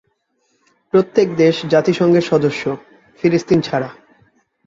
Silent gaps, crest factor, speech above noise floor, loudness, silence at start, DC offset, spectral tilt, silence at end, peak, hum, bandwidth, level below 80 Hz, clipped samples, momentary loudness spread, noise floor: none; 16 dB; 51 dB; -16 LUFS; 0.95 s; under 0.1%; -6.5 dB/octave; 0.75 s; -2 dBFS; none; 7.8 kHz; -56 dBFS; under 0.1%; 10 LU; -66 dBFS